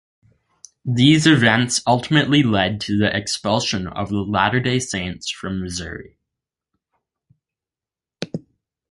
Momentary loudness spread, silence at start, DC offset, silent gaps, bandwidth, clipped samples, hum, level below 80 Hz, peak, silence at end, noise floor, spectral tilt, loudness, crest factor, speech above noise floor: 17 LU; 0.85 s; under 0.1%; none; 11.5 kHz; under 0.1%; none; -46 dBFS; -2 dBFS; 0.55 s; -90 dBFS; -4.5 dB/octave; -18 LUFS; 20 dB; 71 dB